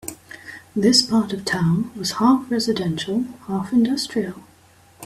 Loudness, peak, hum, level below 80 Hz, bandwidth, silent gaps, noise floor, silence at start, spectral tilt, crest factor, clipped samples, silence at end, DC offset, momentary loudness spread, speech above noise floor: -20 LUFS; -2 dBFS; none; -56 dBFS; 15.5 kHz; none; -52 dBFS; 0.05 s; -4.5 dB/octave; 20 dB; under 0.1%; 0 s; under 0.1%; 15 LU; 32 dB